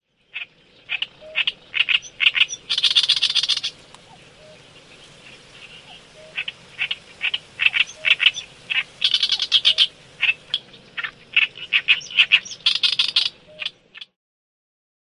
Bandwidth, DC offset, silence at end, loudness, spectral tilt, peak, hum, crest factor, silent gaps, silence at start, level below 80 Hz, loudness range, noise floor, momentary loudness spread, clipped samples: 11.5 kHz; under 0.1%; 0.95 s; -19 LUFS; 1.5 dB/octave; 0 dBFS; none; 22 dB; none; 0.35 s; -64 dBFS; 11 LU; -47 dBFS; 15 LU; under 0.1%